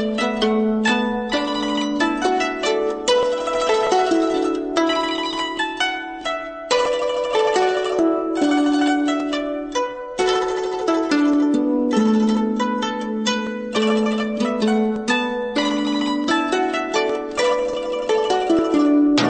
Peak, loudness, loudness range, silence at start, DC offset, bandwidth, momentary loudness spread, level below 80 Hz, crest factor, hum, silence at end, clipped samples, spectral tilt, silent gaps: -4 dBFS; -20 LUFS; 1 LU; 0 s; under 0.1%; 9 kHz; 6 LU; -52 dBFS; 14 dB; none; 0 s; under 0.1%; -4 dB/octave; none